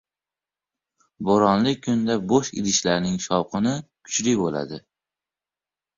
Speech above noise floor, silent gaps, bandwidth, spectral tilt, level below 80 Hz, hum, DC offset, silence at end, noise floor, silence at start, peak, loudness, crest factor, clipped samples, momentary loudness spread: over 68 dB; none; 7.8 kHz; -4.5 dB/octave; -56 dBFS; none; under 0.1%; 1.2 s; under -90 dBFS; 1.2 s; -4 dBFS; -22 LUFS; 20 dB; under 0.1%; 11 LU